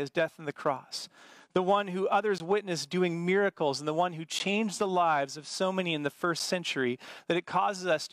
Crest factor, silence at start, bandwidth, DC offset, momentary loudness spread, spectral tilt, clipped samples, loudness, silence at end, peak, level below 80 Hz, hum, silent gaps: 16 dB; 0 s; 15.5 kHz; under 0.1%; 6 LU; -4.5 dB/octave; under 0.1%; -30 LUFS; 0.05 s; -14 dBFS; -78 dBFS; none; none